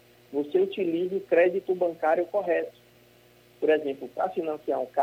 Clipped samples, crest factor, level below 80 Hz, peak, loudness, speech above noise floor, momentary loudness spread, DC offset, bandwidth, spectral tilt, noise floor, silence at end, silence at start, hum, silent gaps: under 0.1%; 16 dB; -74 dBFS; -10 dBFS; -27 LUFS; 31 dB; 9 LU; under 0.1%; 16 kHz; -7 dB/octave; -57 dBFS; 0 s; 0.3 s; 60 Hz at -60 dBFS; none